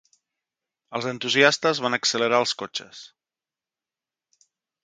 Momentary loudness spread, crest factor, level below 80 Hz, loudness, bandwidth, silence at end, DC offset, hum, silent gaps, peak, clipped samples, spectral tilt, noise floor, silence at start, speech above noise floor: 16 LU; 26 dB; -74 dBFS; -22 LUFS; 9.6 kHz; 1.8 s; under 0.1%; none; none; 0 dBFS; under 0.1%; -2.5 dB/octave; under -90 dBFS; 0.9 s; over 67 dB